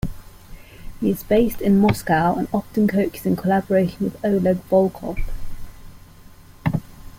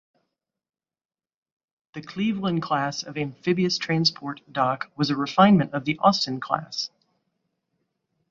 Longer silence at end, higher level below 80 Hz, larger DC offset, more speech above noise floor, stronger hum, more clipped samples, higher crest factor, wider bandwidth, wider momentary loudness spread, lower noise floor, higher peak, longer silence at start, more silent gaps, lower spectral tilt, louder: second, 0 s vs 1.45 s; first, -36 dBFS vs -64 dBFS; neither; second, 25 dB vs over 66 dB; neither; neither; second, 16 dB vs 24 dB; first, 16.5 kHz vs 7.4 kHz; about the same, 13 LU vs 13 LU; second, -44 dBFS vs under -90 dBFS; second, -6 dBFS vs -2 dBFS; second, 0.05 s vs 1.95 s; neither; first, -7.5 dB/octave vs -5.5 dB/octave; first, -20 LUFS vs -24 LUFS